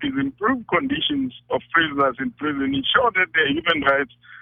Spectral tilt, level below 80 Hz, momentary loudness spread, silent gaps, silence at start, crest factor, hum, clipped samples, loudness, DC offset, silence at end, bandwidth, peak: -7 dB/octave; -52 dBFS; 8 LU; none; 0 s; 18 dB; none; under 0.1%; -21 LUFS; under 0.1%; 0 s; 4.2 kHz; -4 dBFS